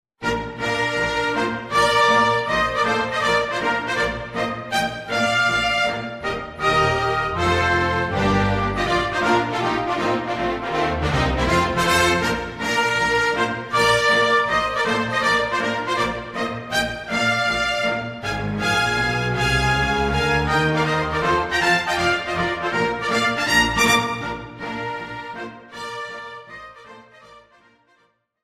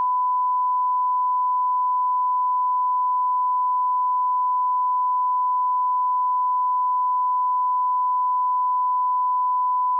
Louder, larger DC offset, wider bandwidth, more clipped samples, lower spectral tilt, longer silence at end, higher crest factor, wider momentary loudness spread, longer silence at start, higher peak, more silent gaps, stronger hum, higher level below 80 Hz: about the same, -20 LUFS vs -21 LUFS; neither; first, 16 kHz vs 1.1 kHz; neither; first, -4 dB/octave vs 25 dB/octave; first, 1.05 s vs 0 s; first, 18 dB vs 4 dB; first, 10 LU vs 0 LU; first, 0.2 s vs 0 s; first, -2 dBFS vs -18 dBFS; neither; neither; first, -38 dBFS vs under -90 dBFS